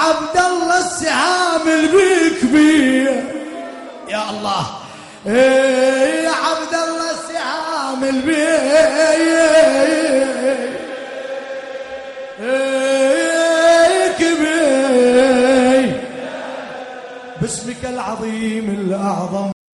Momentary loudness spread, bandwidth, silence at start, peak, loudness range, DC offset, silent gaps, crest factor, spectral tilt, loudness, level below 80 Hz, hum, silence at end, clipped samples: 16 LU; 11.5 kHz; 0 s; -2 dBFS; 6 LU; under 0.1%; none; 12 dB; -3.5 dB/octave; -15 LUFS; -52 dBFS; none; 0.2 s; under 0.1%